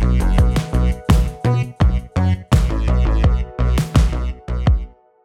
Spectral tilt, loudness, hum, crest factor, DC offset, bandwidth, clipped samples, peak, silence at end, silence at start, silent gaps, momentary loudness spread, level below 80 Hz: -7 dB/octave; -18 LUFS; none; 14 dB; under 0.1%; 13 kHz; under 0.1%; -2 dBFS; 0.35 s; 0 s; none; 4 LU; -18 dBFS